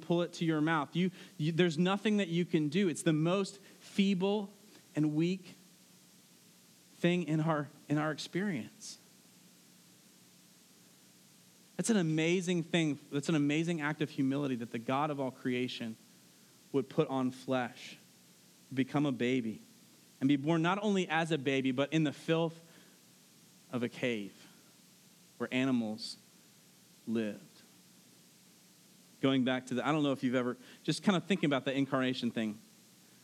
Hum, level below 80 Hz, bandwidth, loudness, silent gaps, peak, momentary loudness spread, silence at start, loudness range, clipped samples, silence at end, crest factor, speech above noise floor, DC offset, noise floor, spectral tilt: none; under -90 dBFS; 14.5 kHz; -33 LUFS; none; -14 dBFS; 12 LU; 0 s; 7 LU; under 0.1%; 0.65 s; 22 dB; 29 dB; under 0.1%; -62 dBFS; -6 dB/octave